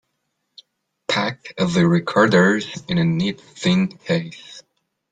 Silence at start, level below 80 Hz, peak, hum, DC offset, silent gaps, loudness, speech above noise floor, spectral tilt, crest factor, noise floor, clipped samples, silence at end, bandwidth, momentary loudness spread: 1.1 s; -56 dBFS; -2 dBFS; none; under 0.1%; none; -19 LUFS; 55 dB; -6 dB/octave; 18 dB; -74 dBFS; under 0.1%; 0.5 s; 9.2 kHz; 13 LU